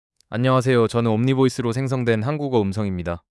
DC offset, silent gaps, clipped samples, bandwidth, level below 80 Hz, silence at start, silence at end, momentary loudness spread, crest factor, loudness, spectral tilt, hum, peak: under 0.1%; none; under 0.1%; 12 kHz; -54 dBFS; 0.3 s; 0.2 s; 8 LU; 14 dB; -21 LUFS; -7 dB/octave; none; -6 dBFS